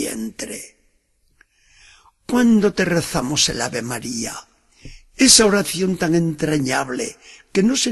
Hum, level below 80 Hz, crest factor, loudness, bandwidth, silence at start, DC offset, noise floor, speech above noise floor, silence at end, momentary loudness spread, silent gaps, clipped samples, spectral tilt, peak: none; -48 dBFS; 20 dB; -18 LUFS; 13 kHz; 0 s; under 0.1%; -62 dBFS; 44 dB; 0 s; 17 LU; none; under 0.1%; -3 dB/octave; 0 dBFS